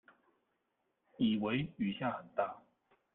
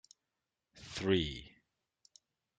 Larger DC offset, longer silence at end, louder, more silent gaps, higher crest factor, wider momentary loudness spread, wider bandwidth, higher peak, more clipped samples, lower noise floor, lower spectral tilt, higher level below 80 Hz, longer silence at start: neither; second, 0.55 s vs 1.1 s; about the same, -37 LUFS vs -35 LUFS; neither; about the same, 18 dB vs 22 dB; second, 6 LU vs 23 LU; second, 4.1 kHz vs 9.2 kHz; about the same, -20 dBFS vs -18 dBFS; neither; second, -82 dBFS vs -89 dBFS; first, -9.5 dB/octave vs -5.5 dB/octave; second, -72 dBFS vs -60 dBFS; first, 1.2 s vs 0.75 s